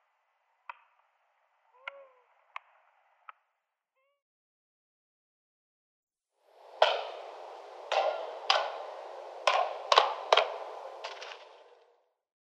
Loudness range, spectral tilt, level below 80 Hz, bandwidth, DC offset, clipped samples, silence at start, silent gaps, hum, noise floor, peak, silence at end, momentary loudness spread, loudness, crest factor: 23 LU; 2.5 dB/octave; under -90 dBFS; 12 kHz; under 0.1%; under 0.1%; 0.7 s; 4.22-6.07 s; none; -83 dBFS; -4 dBFS; 0.85 s; 23 LU; -30 LUFS; 32 dB